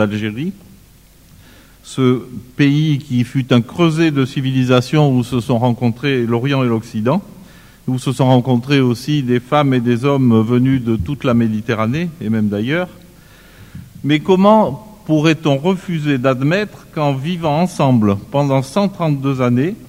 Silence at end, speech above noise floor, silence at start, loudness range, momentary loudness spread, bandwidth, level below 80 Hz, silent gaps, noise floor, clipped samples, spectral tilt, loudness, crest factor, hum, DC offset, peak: 0.05 s; 30 dB; 0 s; 3 LU; 7 LU; 16 kHz; -46 dBFS; none; -45 dBFS; under 0.1%; -7 dB/octave; -16 LUFS; 16 dB; none; under 0.1%; 0 dBFS